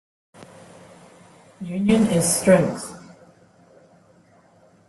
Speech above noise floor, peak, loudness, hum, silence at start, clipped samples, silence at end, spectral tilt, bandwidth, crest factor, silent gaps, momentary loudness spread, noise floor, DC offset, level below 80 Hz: 36 dB; -4 dBFS; -19 LUFS; none; 0.4 s; under 0.1%; 1.9 s; -5 dB/octave; 12.5 kHz; 22 dB; none; 21 LU; -55 dBFS; under 0.1%; -58 dBFS